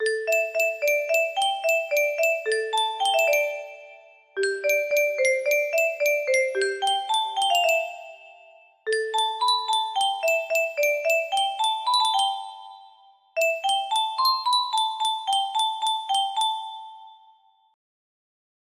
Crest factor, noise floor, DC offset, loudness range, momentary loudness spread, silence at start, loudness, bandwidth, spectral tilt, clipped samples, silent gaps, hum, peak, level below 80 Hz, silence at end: 14 dB; -58 dBFS; under 0.1%; 2 LU; 9 LU; 0 s; -23 LUFS; 15.5 kHz; 1.5 dB/octave; under 0.1%; none; none; -10 dBFS; -78 dBFS; 1.6 s